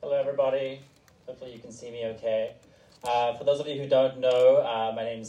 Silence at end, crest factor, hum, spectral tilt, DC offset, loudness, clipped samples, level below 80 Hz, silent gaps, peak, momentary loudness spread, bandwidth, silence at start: 0 s; 16 dB; none; -5 dB/octave; under 0.1%; -26 LUFS; under 0.1%; -70 dBFS; none; -10 dBFS; 22 LU; 10.5 kHz; 0 s